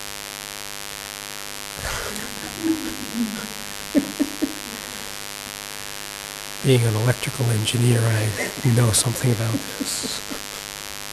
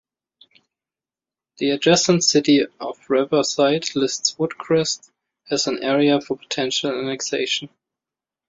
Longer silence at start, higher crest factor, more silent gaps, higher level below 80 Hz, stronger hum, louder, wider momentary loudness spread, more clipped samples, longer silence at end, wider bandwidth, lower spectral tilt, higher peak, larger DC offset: second, 0 s vs 1.6 s; about the same, 20 dB vs 18 dB; neither; first, -48 dBFS vs -64 dBFS; neither; second, -24 LUFS vs -20 LUFS; about the same, 12 LU vs 10 LU; neither; second, 0 s vs 0.8 s; first, 14 kHz vs 7.8 kHz; about the same, -4.5 dB/octave vs -3.5 dB/octave; about the same, -4 dBFS vs -2 dBFS; neither